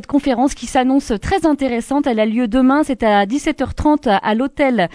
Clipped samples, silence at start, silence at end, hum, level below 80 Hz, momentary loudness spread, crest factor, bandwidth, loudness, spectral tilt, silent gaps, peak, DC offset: under 0.1%; 0.1 s; 0.05 s; none; -36 dBFS; 4 LU; 12 dB; 11 kHz; -16 LUFS; -5.5 dB/octave; none; -2 dBFS; under 0.1%